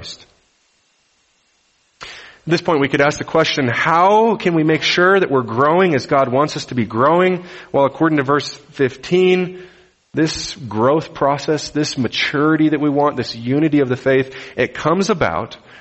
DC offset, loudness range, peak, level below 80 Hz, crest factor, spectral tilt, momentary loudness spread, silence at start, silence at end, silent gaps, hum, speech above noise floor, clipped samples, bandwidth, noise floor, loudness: under 0.1%; 4 LU; 0 dBFS; -52 dBFS; 16 dB; -5.5 dB/octave; 11 LU; 0 s; 0.25 s; none; none; 44 dB; under 0.1%; 8.4 kHz; -60 dBFS; -16 LUFS